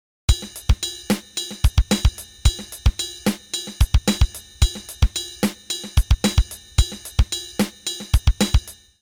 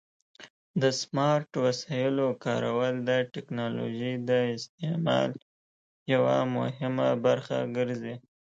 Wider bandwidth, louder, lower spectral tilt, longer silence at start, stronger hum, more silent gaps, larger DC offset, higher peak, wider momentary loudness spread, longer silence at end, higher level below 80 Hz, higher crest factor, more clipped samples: first, over 20 kHz vs 8.6 kHz; first, -23 LUFS vs -28 LUFS; second, -4.5 dB/octave vs -6 dB/octave; about the same, 0.3 s vs 0.4 s; neither; second, none vs 0.50-0.74 s, 4.69-4.78 s, 5.42-6.06 s; neither; first, -2 dBFS vs -12 dBFS; about the same, 6 LU vs 8 LU; about the same, 0.3 s vs 0.25 s; first, -22 dBFS vs -72 dBFS; about the same, 18 dB vs 18 dB; neither